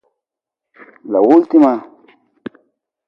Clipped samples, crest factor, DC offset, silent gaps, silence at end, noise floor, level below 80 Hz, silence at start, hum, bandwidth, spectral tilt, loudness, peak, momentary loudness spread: under 0.1%; 16 dB; under 0.1%; none; 1.3 s; -84 dBFS; -66 dBFS; 1.05 s; none; 5.6 kHz; -8.5 dB/octave; -12 LUFS; 0 dBFS; 25 LU